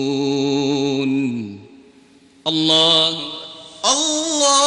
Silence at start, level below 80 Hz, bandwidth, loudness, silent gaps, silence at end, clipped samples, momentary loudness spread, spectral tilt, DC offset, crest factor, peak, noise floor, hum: 0 s; -64 dBFS; 10.5 kHz; -17 LUFS; none; 0 s; under 0.1%; 16 LU; -2.5 dB/octave; under 0.1%; 18 dB; -2 dBFS; -50 dBFS; none